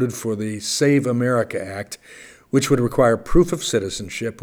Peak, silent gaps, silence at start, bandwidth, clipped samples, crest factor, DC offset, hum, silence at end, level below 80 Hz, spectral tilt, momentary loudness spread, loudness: -2 dBFS; none; 0 s; over 20 kHz; under 0.1%; 18 dB; under 0.1%; none; 0 s; -36 dBFS; -5 dB/octave; 11 LU; -20 LUFS